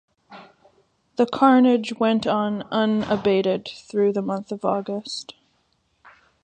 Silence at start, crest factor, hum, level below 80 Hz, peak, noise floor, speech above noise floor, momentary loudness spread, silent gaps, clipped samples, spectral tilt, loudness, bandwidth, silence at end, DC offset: 0.3 s; 20 dB; none; -62 dBFS; -4 dBFS; -67 dBFS; 46 dB; 13 LU; none; under 0.1%; -6 dB/octave; -22 LUFS; 9.2 kHz; 1.1 s; under 0.1%